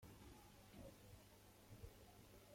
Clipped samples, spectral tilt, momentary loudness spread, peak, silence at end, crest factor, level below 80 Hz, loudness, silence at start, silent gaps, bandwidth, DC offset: under 0.1%; -5 dB/octave; 3 LU; -44 dBFS; 0 s; 18 dB; -70 dBFS; -64 LUFS; 0 s; none; 16.5 kHz; under 0.1%